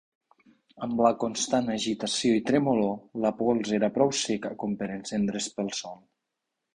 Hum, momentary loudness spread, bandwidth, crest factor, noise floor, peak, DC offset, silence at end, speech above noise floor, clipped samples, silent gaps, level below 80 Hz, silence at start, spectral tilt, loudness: none; 8 LU; 11 kHz; 20 dB; -84 dBFS; -6 dBFS; under 0.1%; 0.8 s; 57 dB; under 0.1%; none; -64 dBFS; 0.75 s; -4.5 dB/octave; -27 LUFS